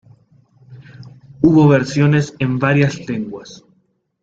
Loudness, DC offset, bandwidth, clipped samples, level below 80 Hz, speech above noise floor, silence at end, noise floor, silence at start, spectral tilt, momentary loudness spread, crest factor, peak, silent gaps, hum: -15 LUFS; under 0.1%; 7.8 kHz; under 0.1%; -52 dBFS; 47 dB; 0.7 s; -62 dBFS; 0.7 s; -7.5 dB/octave; 13 LU; 16 dB; 0 dBFS; none; none